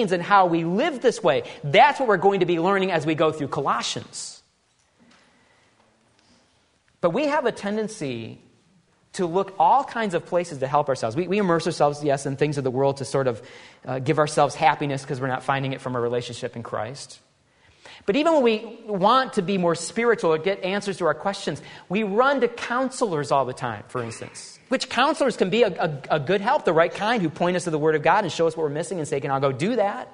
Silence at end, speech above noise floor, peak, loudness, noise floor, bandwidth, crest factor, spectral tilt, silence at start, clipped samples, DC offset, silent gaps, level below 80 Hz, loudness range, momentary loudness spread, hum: 0.05 s; 42 dB; -2 dBFS; -23 LUFS; -65 dBFS; 11 kHz; 20 dB; -5 dB/octave; 0 s; under 0.1%; under 0.1%; none; -64 dBFS; 7 LU; 12 LU; none